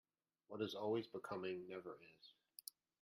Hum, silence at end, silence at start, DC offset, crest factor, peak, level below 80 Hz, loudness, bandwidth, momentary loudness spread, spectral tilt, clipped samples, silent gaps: none; 0.7 s; 0.5 s; under 0.1%; 18 dB; -30 dBFS; -90 dBFS; -48 LUFS; 15.5 kHz; 17 LU; -5 dB/octave; under 0.1%; none